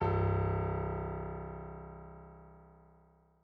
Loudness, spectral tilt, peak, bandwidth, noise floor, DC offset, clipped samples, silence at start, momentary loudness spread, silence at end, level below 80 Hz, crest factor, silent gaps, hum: -36 LUFS; -8.5 dB/octave; -20 dBFS; 4.8 kHz; -65 dBFS; under 0.1%; under 0.1%; 0 s; 22 LU; 0.7 s; -48 dBFS; 16 dB; none; none